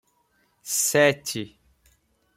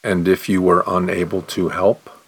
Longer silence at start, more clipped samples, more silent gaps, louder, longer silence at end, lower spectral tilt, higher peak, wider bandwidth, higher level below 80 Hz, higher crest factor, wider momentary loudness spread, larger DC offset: first, 0.65 s vs 0.05 s; neither; neither; second, -22 LUFS vs -18 LUFS; first, 0.9 s vs 0.15 s; second, -2.5 dB/octave vs -6.5 dB/octave; second, -8 dBFS vs -2 dBFS; second, 16.5 kHz vs 19.5 kHz; second, -66 dBFS vs -50 dBFS; about the same, 20 dB vs 16 dB; first, 21 LU vs 6 LU; neither